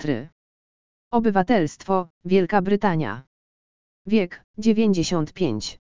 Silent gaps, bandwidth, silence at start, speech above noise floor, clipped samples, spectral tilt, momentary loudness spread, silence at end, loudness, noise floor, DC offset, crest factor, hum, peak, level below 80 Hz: 0.32-1.11 s, 2.10-2.21 s, 3.27-4.05 s, 4.44-4.54 s; 7.6 kHz; 0 s; over 68 dB; under 0.1%; -6 dB/octave; 10 LU; 0.15 s; -22 LUFS; under -90 dBFS; 1%; 20 dB; none; -4 dBFS; -52 dBFS